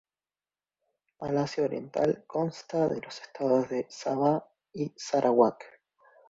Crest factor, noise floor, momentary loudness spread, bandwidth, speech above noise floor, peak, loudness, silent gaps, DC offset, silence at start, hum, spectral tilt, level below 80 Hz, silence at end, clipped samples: 24 dB; under -90 dBFS; 12 LU; 8 kHz; over 62 dB; -6 dBFS; -29 LUFS; none; under 0.1%; 1.2 s; none; -6.5 dB/octave; -68 dBFS; 0.6 s; under 0.1%